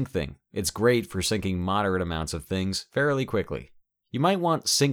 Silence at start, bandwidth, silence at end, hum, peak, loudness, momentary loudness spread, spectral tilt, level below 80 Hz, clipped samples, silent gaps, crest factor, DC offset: 0 s; over 20 kHz; 0 s; none; -10 dBFS; -26 LUFS; 9 LU; -4.5 dB/octave; -48 dBFS; under 0.1%; none; 16 dB; under 0.1%